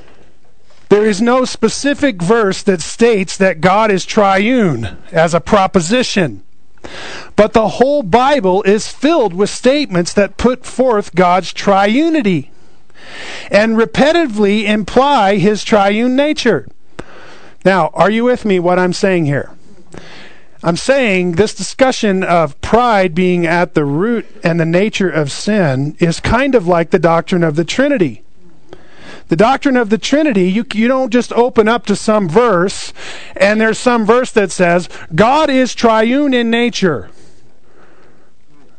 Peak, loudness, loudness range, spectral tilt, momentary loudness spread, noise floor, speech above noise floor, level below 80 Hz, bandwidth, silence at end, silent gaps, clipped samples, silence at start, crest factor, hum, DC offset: 0 dBFS; -13 LUFS; 2 LU; -5.5 dB/octave; 6 LU; -51 dBFS; 39 dB; -40 dBFS; 9.4 kHz; 1.7 s; none; under 0.1%; 0.9 s; 14 dB; none; 4%